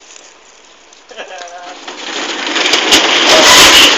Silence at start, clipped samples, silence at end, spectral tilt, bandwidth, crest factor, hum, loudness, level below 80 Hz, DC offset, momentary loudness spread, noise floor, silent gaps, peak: 1.15 s; 1%; 0 s; 0 dB/octave; over 20 kHz; 10 dB; none; -6 LUFS; -40 dBFS; 0.2%; 26 LU; -41 dBFS; none; 0 dBFS